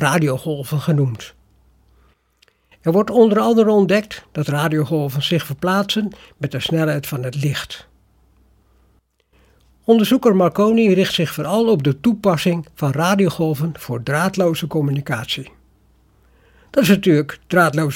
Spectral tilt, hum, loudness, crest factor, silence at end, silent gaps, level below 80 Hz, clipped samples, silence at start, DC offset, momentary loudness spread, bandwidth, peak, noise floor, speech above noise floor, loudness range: -6 dB/octave; none; -18 LUFS; 18 dB; 0 s; none; -54 dBFS; under 0.1%; 0 s; under 0.1%; 11 LU; 17 kHz; 0 dBFS; -59 dBFS; 42 dB; 6 LU